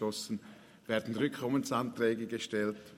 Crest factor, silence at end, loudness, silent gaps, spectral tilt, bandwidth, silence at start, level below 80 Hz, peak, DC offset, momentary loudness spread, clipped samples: 18 dB; 0 s; -34 LUFS; none; -5 dB/octave; 16 kHz; 0 s; -76 dBFS; -16 dBFS; under 0.1%; 9 LU; under 0.1%